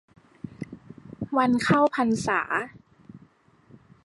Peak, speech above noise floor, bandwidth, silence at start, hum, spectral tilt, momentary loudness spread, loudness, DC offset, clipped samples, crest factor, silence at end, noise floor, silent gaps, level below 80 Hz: -8 dBFS; 35 dB; 11.5 kHz; 0.45 s; none; -5.5 dB/octave; 23 LU; -24 LUFS; under 0.1%; under 0.1%; 20 dB; 0.85 s; -58 dBFS; none; -60 dBFS